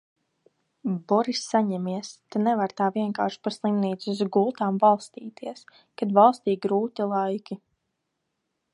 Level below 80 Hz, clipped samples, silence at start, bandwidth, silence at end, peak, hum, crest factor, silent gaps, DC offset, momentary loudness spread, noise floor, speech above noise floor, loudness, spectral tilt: -78 dBFS; under 0.1%; 0.85 s; 11 kHz; 1.2 s; -4 dBFS; none; 20 dB; none; under 0.1%; 15 LU; -79 dBFS; 55 dB; -25 LUFS; -6 dB/octave